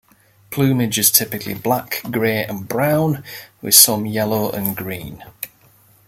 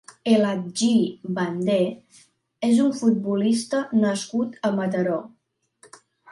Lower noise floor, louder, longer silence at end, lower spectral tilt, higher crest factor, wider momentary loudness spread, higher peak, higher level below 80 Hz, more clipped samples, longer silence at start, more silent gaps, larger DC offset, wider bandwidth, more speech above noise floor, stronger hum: second, -52 dBFS vs -59 dBFS; first, -16 LUFS vs -23 LUFS; first, 0.6 s vs 0 s; second, -3 dB/octave vs -5.5 dB/octave; about the same, 20 dB vs 16 dB; first, 20 LU vs 7 LU; first, 0 dBFS vs -6 dBFS; first, -54 dBFS vs -70 dBFS; neither; first, 0.5 s vs 0.25 s; neither; neither; first, 17 kHz vs 11.5 kHz; about the same, 34 dB vs 37 dB; neither